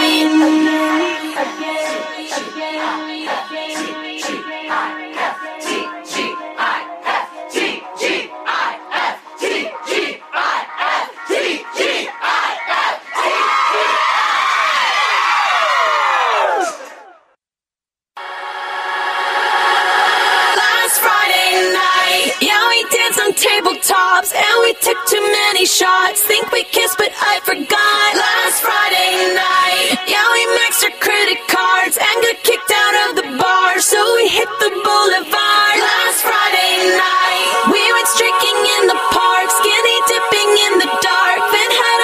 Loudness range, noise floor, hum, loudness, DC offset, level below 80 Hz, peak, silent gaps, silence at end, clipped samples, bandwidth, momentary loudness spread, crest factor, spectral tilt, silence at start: 9 LU; under -90 dBFS; none; -14 LUFS; under 0.1%; -62 dBFS; 0 dBFS; none; 0 s; under 0.1%; 15.5 kHz; 10 LU; 14 dB; 0 dB/octave; 0 s